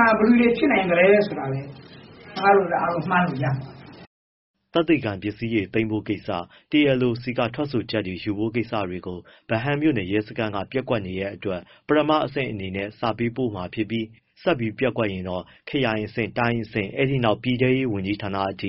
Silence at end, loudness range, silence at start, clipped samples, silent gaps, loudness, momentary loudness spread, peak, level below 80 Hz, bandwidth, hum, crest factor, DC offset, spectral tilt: 0 s; 5 LU; 0 s; under 0.1%; 4.07-4.54 s; -23 LUFS; 12 LU; -4 dBFS; -54 dBFS; 5.8 kHz; none; 20 dB; under 0.1%; -5 dB/octave